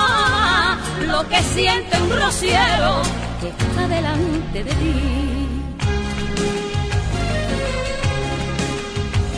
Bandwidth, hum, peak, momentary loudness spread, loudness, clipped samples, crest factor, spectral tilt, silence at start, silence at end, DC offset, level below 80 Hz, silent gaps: 11 kHz; none; -4 dBFS; 8 LU; -19 LUFS; under 0.1%; 16 dB; -4.5 dB/octave; 0 s; 0 s; under 0.1%; -28 dBFS; none